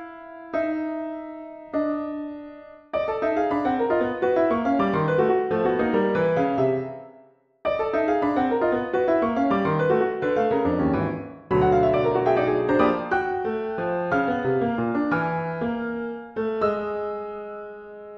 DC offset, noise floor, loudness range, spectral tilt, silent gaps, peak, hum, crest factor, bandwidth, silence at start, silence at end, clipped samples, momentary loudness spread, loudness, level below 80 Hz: under 0.1%; -54 dBFS; 5 LU; -8.5 dB/octave; none; -6 dBFS; none; 18 dB; 6.6 kHz; 0 s; 0 s; under 0.1%; 12 LU; -24 LUFS; -52 dBFS